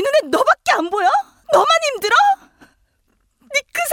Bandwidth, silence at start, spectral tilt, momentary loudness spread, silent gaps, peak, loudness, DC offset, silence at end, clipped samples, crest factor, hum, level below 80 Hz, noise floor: 19 kHz; 0 s; -1 dB/octave; 8 LU; none; -2 dBFS; -16 LUFS; under 0.1%; 0 s; under 0.1%; 16 dB; none; -60 dBFS; -64 dBFS